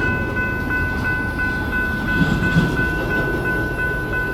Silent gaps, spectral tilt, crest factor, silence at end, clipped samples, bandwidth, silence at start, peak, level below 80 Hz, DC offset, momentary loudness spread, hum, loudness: none; -6.5 dB/octave; 16 dB; 0 s; under 0.1%; 16 kHz; 0 s; -4 dBFS; -30 dBFS; under 0.1%; 4 LU; none; -20 LUFS